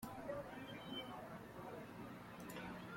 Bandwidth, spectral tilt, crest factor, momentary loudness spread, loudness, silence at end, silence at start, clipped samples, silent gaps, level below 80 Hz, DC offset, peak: 16.5 kHz; -5 dB/octave; 16 dB; 5 LU; -51 LUFS; 0 s; 0 s; under 0.1%; none; -72 dBFS; under 0.1%; -36 dBFS